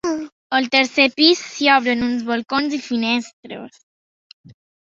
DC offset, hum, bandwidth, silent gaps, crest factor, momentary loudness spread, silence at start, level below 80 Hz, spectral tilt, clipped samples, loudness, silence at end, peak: under 0.1%; none; 7.8 kHz; 0.32-0.50 s, 3.33-3.43 s, 3.83-4.44 s; 18 dB; 17 LU; 0.05 s; -58 dBFS; -2.5 dB/octave; under 0.1%; -17 LUFS; 0.35 s; -2 dBFS